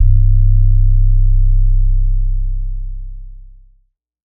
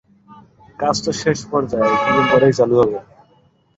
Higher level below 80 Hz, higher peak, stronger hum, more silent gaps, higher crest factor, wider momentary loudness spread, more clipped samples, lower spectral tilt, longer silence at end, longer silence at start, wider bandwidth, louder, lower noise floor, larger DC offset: first, -12 dBFS vs -50 dBFS; about the same, -2 dBFS vs -2 dBFS; neither; neither; second, 10 dB vs 16 dB; first, 17 LU vs 7 LU; neither; first, -26 dB/octave vs -5 dB/octave; first, 0.95 s vs 0.75 s; second, 0 s vs 0.8 s; second, 0.2 kHz vs 8 kHz; about the same, -16 LUFS vs -16 LUFS; about the same, -57 dBFS vs -56 dBFS; neither